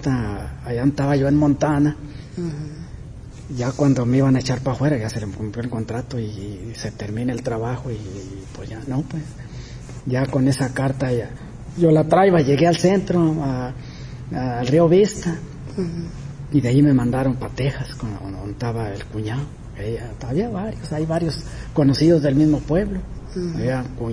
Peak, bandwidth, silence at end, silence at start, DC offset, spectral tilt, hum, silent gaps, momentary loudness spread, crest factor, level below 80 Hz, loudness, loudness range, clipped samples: -4 dBFS; 11 kHz; 0 s; 0 s; under 0.1%; -7.5 dB/octave; none; none; 18 LU; 18 dB; -38 dBFS; -21 LUFS; 9 LU; under 0.1%